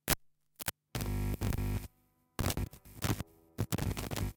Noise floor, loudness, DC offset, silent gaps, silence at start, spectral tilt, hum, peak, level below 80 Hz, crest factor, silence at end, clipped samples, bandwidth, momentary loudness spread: -72 dBFS; -38 LUFS; under 0.1%; none; 0.05 s; -4.5 dB/octave; none; -12 dBFS; -44 dBFS; 26 dB; 0.05 s; under 0.1%; 19 kHz; 7 LU